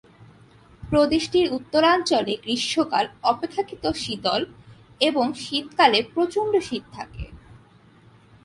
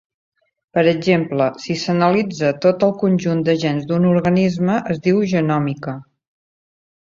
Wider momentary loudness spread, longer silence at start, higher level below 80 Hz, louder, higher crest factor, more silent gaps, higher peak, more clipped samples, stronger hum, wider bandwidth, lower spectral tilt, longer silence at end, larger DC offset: first, 14 LU vs 6 LU; about the same, 0.8 s vs 0.75 s; first, -50 dBFS vs -56 dBFS; second, -22 LUFS vs -18 LUFS; first, 22 dB vs 16 dB; neither; about the same, -2 dBFS vs -2 dBFS; neither; neither; first, 11.5 kHz vs 7.6 kHz; second, -4 dB/octave vs -7 dB/octave; about the same, 0.9 s vs 1 s; neither